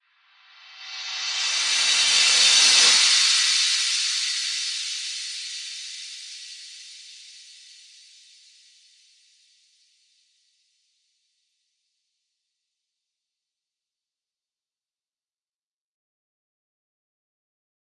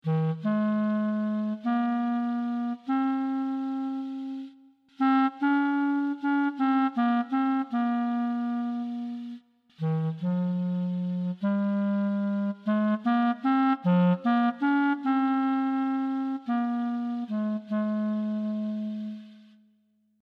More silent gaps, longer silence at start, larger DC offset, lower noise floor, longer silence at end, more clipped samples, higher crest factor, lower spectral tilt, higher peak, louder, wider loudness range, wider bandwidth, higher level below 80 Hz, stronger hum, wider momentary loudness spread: neither; first, 0.7 s vs 0.05 s; neither; first, under -90 dBFS vs -68 dBFS; first, 10.6 s vs 0.8 s; neither; first, 22 dB vs 14 dB; second, 4.5 dB/octave vs -9.5 dB/octave; first, -4 dBFS vs -12 dBFS; first, -18 LUFS vs -27 LUFS; first, 21 LU vs 5 LU; first, 11.5 kHz vs 5.4 kHz; about the same, under -90 dBFS vs -88 dBFS; neither; first, 24 LU vs 8 LU